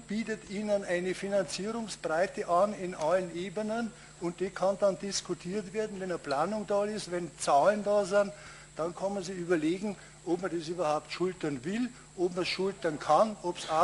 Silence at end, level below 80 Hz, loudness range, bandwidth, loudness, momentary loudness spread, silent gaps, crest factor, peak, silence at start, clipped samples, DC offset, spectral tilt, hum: 0 s; -62 dBFS; 3 LU; 11.5 kHz; -32 LUFS; 10 LU; none; 18 dB; -12 dBFS; 0 s; under 0.1%; under 0.1%; -4.5 dB/octave; none